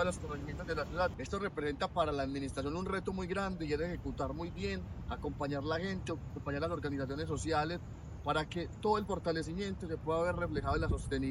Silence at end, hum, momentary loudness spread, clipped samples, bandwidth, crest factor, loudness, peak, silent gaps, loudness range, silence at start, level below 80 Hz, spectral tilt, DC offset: 0 s; none; 7 LU; under 0.1%; 13.5 kHz; 18 dB; -37 LUFS; -18 dBFS; none; 3 LU; 0 s; -48 dBFS; -6 dB/octave; under 0.1%